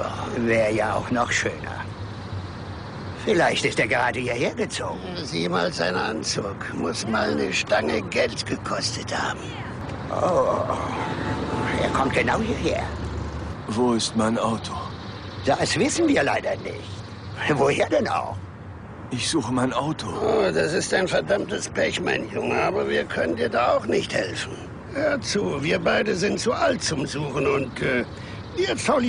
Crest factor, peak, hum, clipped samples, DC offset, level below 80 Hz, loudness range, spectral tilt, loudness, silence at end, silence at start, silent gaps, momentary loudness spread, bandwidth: 14 dB; -10 dBFS; none; under 0.1%; under 0.1%; -44 dBFS; 2 LU; -4.5 dB/octave; -24 LUFS; 0 s; 0 s; none; 12 LU; 10.5 kHz